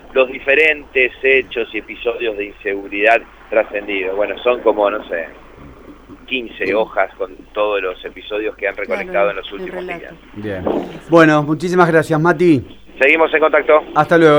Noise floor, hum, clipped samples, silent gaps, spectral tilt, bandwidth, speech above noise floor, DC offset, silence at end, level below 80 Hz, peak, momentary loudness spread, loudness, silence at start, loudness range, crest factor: -38 dBFS; none; under 0.1%; none; -6.5 dB/octave; over 20 kHz; 23 dB; under 0.1%; 0 s; -46 dBFS; 0 dBFS; 13 LU; -16 LUFS; 0.1 s; 8 LU; 16 dB